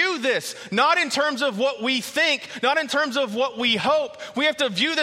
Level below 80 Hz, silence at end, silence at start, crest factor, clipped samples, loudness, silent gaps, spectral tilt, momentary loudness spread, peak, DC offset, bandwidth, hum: -70 dBFS; 0 s; 0 s; 16 dB; under 0.1%; -22 LUFS; none; -2.5 dB/octave; 5 LU; -6 dBFS; under 0.1%; 16 kHz; none